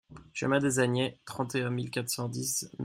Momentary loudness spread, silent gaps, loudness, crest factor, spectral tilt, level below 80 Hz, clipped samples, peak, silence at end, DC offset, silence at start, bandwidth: 8 LU; none; -31 LUFS; 18 dB; -4.5 dB/octave; -66 dBFS; under 0.1%; -12 dBFS; 0 s; under 0.1%; 0.1 s; 16 kHz